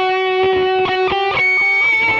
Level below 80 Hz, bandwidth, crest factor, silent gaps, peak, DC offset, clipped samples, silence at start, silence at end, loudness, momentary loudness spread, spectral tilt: -48 dBFS; 7.2 kHz; 8 dB; none; -6 dBFS; under 0.1%; under 0.1%; 0 s; 0 s; -14 LUFS; 4 LU; -4.5 dB/octave